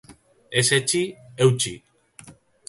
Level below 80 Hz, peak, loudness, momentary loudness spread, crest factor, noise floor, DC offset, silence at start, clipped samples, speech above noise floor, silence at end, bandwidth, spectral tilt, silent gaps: -58 dBFS; -6 dBFS; -21 LUFS; 10 LU; 20 dB; -49 dBFS; under 0.1%; 0.1 s; under 0.1%; 28 dB; 0.4 s; 12 kHz; -3.5 dB/octave; none